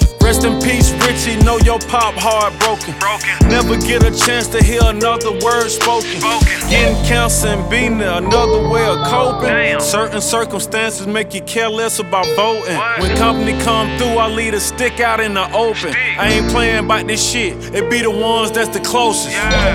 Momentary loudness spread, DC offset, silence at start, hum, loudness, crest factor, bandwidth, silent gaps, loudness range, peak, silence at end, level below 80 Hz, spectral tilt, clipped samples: 5 LU; under 0.1%; 0 s; none; -14 LUFS; 14 dB; 17.5 kHz; none; 2 LU; 0 dBFS; 0 s; -22 dBFS; -4 dB/octave; under 0.1%